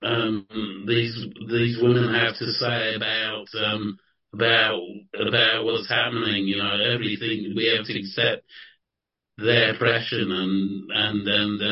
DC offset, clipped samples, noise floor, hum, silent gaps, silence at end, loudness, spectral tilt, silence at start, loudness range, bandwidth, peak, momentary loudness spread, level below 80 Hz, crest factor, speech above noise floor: under 0.1%; under 0.1%; -85 dBFS; none; none; 0 s; -22 LUFS; -8.5 dB/octave; 0 s; 2 LU; 6 kHz; -4 dBFS; 10 LU; -60 dBFS; 18 dB; 61 dB